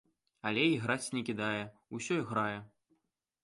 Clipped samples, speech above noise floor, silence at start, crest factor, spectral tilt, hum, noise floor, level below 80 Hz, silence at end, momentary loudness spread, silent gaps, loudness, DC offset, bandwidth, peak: under 0.1%; 46 dB; 0.45 s; 20 dB; -4.5 dB/octave; none; -81 dBFS; -74 dBFS; 0.75 s; 12 LU; none; -34 LUFS; under 0.1%; 11.5 kHz; -16 dBFS